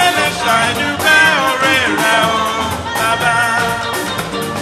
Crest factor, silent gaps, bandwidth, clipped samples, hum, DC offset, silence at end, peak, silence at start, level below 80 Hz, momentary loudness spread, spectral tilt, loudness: 14 dB; none; 14 kHz; under 0.1%; none; under 0.1%; 0 s; 0 dBFS; 0 s; -42 dBFS; 9 LU; -2.5 dB/octave; -13 LUFS